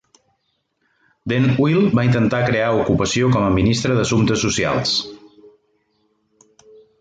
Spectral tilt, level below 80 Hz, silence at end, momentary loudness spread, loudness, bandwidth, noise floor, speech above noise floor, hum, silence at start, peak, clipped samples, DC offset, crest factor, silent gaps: -5.5 dB/octave; -42 dBFS; 1.85 s; 4 LU; -17 LUFS; 9.2 kHz; -69 dBFS; 53 dB; none; 1.25 s; -4 dBFS; under 0.1%; under 0.1%; 14 dB; none